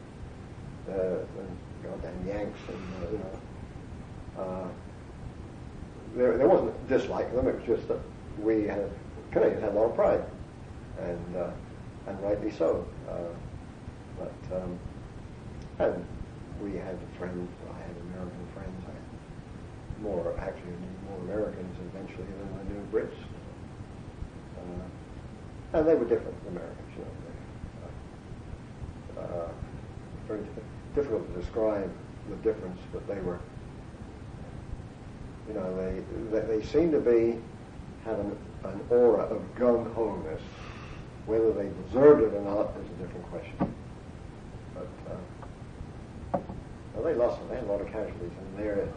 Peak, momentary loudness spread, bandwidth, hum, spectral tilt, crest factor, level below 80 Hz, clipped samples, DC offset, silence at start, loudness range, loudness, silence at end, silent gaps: -8 dBFS; 18 LU; 10 kHz; none; -8 dB/octave; 24 dB; -48 dBFS; under 0.1%; under 0.1%; 0 s; 12 LU; -31 LUFS; 0 s; none